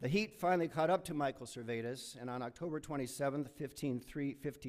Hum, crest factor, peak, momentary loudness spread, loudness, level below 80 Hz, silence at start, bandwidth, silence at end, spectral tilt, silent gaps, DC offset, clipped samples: none; 16 dB; -22 dBFS; 9 LU; -39 LUFS; -68 dBFS; 0 s; 15.5 kHz; 0 s; -5.5 dB/octave; none; under 0.1%; under 0.1%